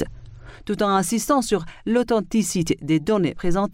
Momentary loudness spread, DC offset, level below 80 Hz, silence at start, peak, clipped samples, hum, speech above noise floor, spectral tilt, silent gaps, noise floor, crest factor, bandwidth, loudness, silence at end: 5 LU; under 0.1%; -40 dBFS; 0 s; -6 dBFS; under 0.1%; none; 20 dB; -5 dB/octave; none; -41 dBFS; 16 dB; 16 kHz; -22 LUFS; 0 s